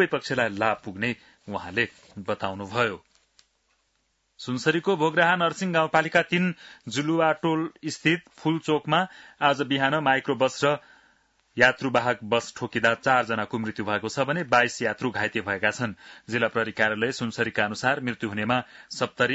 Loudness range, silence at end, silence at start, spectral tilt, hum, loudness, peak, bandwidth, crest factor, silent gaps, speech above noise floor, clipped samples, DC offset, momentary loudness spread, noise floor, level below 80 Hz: 5 LU; 0 s; 0 s; -5 dB/octave; none; -25 LUFS; -4 dBFS; 8 kHz; 20 dB; none; 47 dB; under 0.1%; under 0.1%; 10 LU; -72 dBFS; -66 dBFS